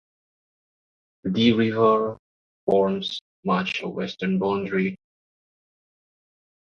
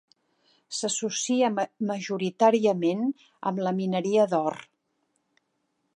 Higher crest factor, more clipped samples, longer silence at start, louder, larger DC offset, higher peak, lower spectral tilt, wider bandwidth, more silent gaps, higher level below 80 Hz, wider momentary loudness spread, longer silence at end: about the same, 18 dB vs 20 dB; neither; first, 1.25 s vs 0.7 s; first, -23 LUFS vs -26 LUFS; neither; about the same, -6 dBFS vs -8 dBFS; first, -7 dB/octave vs -4.5 dB/octave; second, 7 kHz vs 11 kHz; first, 2.19-2.67 s, 3.21-3.43 s vs none; first, -62 dBFS vs -80 dBFS; about the same, 12 LU vs 10 LU; first, 1.8 s vs 1.3 s